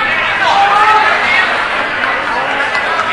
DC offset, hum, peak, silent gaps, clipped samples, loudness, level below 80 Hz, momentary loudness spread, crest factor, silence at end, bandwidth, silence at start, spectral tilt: under 0.1%; none; 0 dBFS; none; under 0.1%; -11 LUFS; -44 dBFS; 6 LU; 12 dB; 0 s; 11.5 kHz; 0 s; -2.5 dB/octave